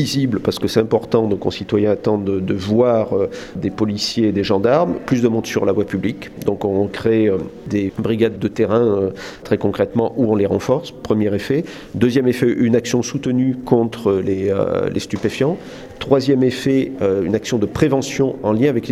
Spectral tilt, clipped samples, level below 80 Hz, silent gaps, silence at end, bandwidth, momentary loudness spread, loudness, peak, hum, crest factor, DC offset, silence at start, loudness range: -6.5 dB/octave; under 0.1%; -48 dBFS; none; 0 s; 15 kHz; 6 LU; -18 LUFS; 0 dBFS; none; 18 dB; under 0.1%; 0 s; 1 LU